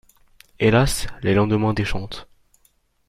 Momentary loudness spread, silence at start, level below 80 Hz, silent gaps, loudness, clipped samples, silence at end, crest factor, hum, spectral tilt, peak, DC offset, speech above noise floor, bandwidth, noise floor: 15 LU; 0.6 s; -36 dBFS; none; -20 LUFS; under 0.1%; 0.85 s; 18 dB; none; -5.5 dB/octave; -4 dBFS; under 0.1%; 43 dB; 15.5 kHz; -62 dBFS